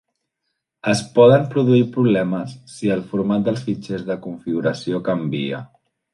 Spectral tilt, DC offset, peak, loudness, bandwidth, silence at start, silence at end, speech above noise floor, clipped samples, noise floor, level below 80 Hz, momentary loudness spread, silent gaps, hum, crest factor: -7 dB/octave; under 0.1%; -2 dBFS; -19 LUFS; 11.5 kHz; 0.85 s; 0.5 s; 58 dB; under 0.1%; -77 dBFS; -58 dBFS; 14 LU; none; none; 18 dB